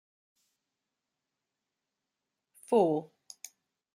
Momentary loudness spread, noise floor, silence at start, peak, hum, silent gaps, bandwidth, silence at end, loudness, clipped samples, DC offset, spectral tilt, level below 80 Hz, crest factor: 23 LU; -88 dBFS; 2.7 s; -14 dBFS; none; none; 15 kHz; 0.9 s; -29 LUFS; under 0.1%; under 0.1%; -6.5 dB/octave; -88 dBFS; 24 dB